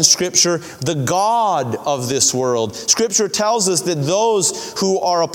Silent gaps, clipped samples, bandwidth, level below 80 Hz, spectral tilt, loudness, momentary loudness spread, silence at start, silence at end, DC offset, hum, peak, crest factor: none; under 0.1%; 19 kHz; -58 dBFS; -2.5 dB/octave; -16 LUFS; 7 LU; 0 s; 0 s; under 0.1%; none; 0 dBFS; 18 dB